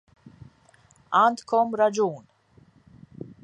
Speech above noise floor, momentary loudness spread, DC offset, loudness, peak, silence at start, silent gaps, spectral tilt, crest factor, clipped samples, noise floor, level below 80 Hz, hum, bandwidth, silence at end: 36 dB; 23 LU; under 0.1%; -23 LUFS; -8 dBFS; 0.25 s; none; -5 dB/octave; 18 dB; under 0.1%; -58 dBFS; -66 dBFS; none; 10.5 kHz; 0.15 s